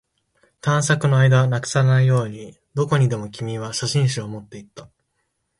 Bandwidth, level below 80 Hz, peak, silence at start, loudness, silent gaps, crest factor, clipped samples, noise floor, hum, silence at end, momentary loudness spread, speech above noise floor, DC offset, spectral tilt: 11.5 kHz; -56 dBFS; -4 dBFS; 0.65 s; -20 LUFS; none; 18 dB; under 0.1%; -73 dBFS; none; 0.75 s; 17 LU; 53 dB; under 0.1%; -5.5 dB/octave